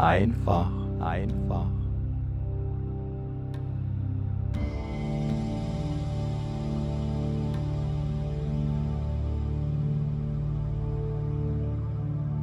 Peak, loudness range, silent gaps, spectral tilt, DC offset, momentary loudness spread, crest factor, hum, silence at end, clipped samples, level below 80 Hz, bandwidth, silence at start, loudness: -8 dBFS; 2 LU; none; -9 dB/octave; under 0.1%; 4 LU; 20 dB; none; 0 s; under 0.1%; -36 dBFS; 8 kHz; 0 s; -30 LUFS